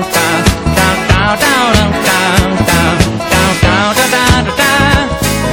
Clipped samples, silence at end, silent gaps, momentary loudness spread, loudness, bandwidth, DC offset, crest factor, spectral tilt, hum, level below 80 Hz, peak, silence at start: 0.3%; 0 s; none; 2 LU; -10 LUFS; over 20 kHz; under 0.1%; 10 dB; -4 dB/octave; none; -22 dBFS; 0 dBFS; 0 s